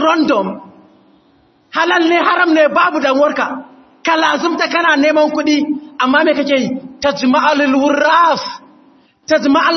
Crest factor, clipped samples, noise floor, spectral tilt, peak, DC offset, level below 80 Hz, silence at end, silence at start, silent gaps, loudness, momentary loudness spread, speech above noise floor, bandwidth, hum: 14 dB; under 0.1%; -52 dBFS; -4 dB/octave; 0 dBFS; under 0.1%; -60 dBFS; 0 s; 0 s; none; -13 LUFS; 10 LU; 40 dB; 6.4 kHz; none